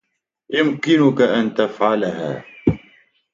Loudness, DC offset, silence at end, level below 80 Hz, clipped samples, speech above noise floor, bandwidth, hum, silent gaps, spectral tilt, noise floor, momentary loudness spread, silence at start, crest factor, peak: -18 LUFS; under 0.1%; 0.55 s; -48 dBFS; under 0.1%; 37 dB; 7.6 kHz; none; none; -6.5 dB/octave; -54 dBFS; 10 LU; 0.5 s; 18 dB; -2 dBFS